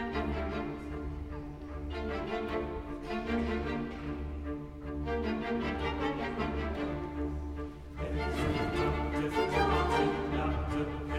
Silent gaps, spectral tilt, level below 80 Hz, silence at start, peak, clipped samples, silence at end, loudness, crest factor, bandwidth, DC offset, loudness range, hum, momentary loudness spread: none; -7 dB/octave; -40 dBFS; 0 s; -16 dBFS; under 0.1%; 0 s; -34 LUFS; 18 dB; 12.5 kHz; under 0.1%; 5 LU; none; 11 LU